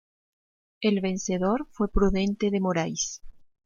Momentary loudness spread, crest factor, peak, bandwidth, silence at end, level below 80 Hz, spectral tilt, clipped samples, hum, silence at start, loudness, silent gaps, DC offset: 5 LU; 18 dB; -8 dBFS; 7.4 kHz; 0.25 s; -38 dBFS; -5 dB/octave; under 0.1%; none; 0.8 s; -27 LUFS; none; under 0.1%